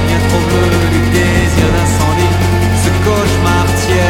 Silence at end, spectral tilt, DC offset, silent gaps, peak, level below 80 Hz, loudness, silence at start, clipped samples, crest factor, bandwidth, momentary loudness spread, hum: 0 s; -5.5 dB/octave; under 0.1%; none; 0 dBFS; -22 dBFS; -11 LUFS; 0 s; under 0.1%; 10 dB; 16.5 kHz; 1 LU; none